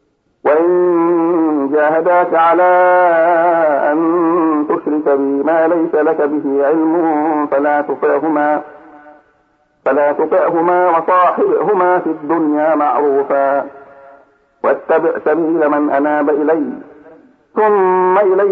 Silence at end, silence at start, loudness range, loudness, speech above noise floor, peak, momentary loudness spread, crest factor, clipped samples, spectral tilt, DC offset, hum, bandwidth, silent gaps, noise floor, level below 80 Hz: 0 s; 0.45 s; 4 LU; -13 LUFS; 44 dB; -2 dBFS; 5 LU; 10 dB; under 0.1%; -9 dB/octave; under 0.1%; none; 4.2 kHz; none; -57 dBFS; -68 dBFS